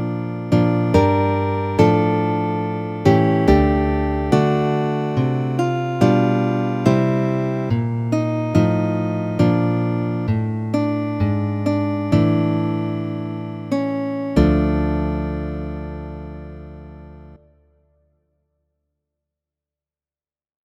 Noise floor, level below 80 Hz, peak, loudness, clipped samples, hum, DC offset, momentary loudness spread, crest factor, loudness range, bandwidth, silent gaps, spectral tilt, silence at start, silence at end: under -90 dBFS; -34 dBFS; 0 dBFS; -19 LUFS; under 0.1%; none; under 0.1%; 11 LU; 20 dB; 7 LU; 9.2 kHz; none; -8.5 dB/octave; 0 s; 3.3 s